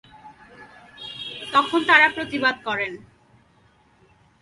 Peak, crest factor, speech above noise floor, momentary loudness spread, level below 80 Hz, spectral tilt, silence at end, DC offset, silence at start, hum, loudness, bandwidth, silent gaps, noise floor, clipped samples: -2 dBFS; 24 dB; 38 dB; 21 LU; -62 dBFS; -3.5 dB/octave; 1.45 s; under 0.1%; 0.25 s; none; -20 LUFS; 11.5 kHz; none; -58 dBFS; under 0.1%